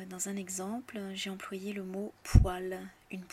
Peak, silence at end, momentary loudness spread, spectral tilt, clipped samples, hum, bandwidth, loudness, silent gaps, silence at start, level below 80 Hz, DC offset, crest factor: -10 dBFS; 0.05 s; 14 LU; -5.5 dB/octave; under 0.1%; none; 15 kHz; -34 LUFS; none; 0 s; -36 dBFS; under 0.1%; 24 dB